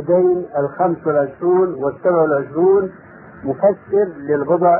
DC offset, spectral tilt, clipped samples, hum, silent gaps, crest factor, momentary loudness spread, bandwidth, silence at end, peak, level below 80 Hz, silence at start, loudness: under 0.1%; -14 dB/octave; under 0.1%; none; none; 14 dB; 6 LU; 2.6 kHz; 0 s; -2 dBFS; -56 dBFS; 0 s; -17 LUFS